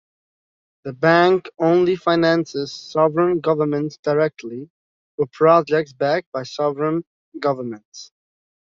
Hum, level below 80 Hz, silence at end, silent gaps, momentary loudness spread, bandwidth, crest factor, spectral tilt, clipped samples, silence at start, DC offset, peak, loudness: none; -64 dBFS; 0.65 s; 3.99-4.03 s, 4.70-5.18 s, 6.26-6.32 s, 7.07-7.32 s, 7.85-7.92 s; 19 LU; 7.4 kHz; 18 dB; -6.5 dB/octave; under 0.1%; 0.85 s; under 0.1%; -2 dBFS; -19 LUFS